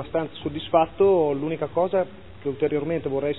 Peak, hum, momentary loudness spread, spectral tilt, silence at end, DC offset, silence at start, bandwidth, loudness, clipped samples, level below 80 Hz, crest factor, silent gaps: -6 dBFS; none; 12 LU; -11 dB/octave; 0 s; 0.5%; 0 s; 4.1 kHz; -24 LUFS; under 0.1%; -54 dBFS; 18 dB; none